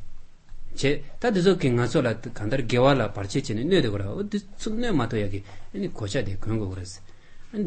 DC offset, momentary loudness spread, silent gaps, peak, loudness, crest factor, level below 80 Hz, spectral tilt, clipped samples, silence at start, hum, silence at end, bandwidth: under 0.1%; 14 LU; none; -8 dBFS; -26 LUFS; 18 dB; -38 dBFS; -6 dB/octave; under 0.1%; 0 s; none; 0 s; 8.8 kHz